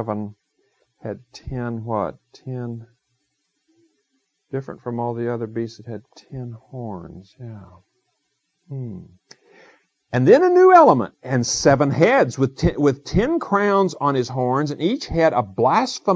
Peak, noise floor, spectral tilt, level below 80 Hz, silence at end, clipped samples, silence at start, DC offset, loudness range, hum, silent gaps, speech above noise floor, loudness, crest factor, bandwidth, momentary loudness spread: 0 dBFS; -73 dBFS; -6 dB/octave; -44 dBFS; 0 s; under 0.1%; 0 s; under 0.1%; 20 LU; none; none; 53 dB; -19 LUFS; 20 dB; 8 kHz; 22 LU